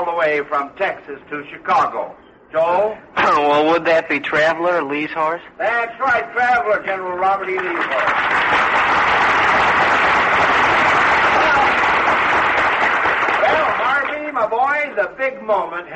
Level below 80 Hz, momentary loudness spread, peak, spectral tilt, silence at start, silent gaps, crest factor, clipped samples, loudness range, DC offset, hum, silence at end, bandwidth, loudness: -48 dBFS; 9 LU; -4 dBFS; -4 dB/octave; 0 s; none; 14 dB; under 0.1%; 5 LU; under 0.1%; none; 0 s; 8.4 kHz; -16 LUFS